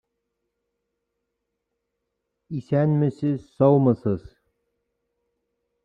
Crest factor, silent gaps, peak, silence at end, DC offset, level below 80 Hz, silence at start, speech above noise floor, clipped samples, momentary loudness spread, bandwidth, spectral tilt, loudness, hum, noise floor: 20 dB; none; -6 dBFS; 1.65 s; under 0.1%; -60 dBFS; 2.5 s; 59 dB; under 0.1%; 14 LU; 5 kHz; -11 dB/octave; -22 LUFS; 50 Hz at -40 dBFS; -80 dBFS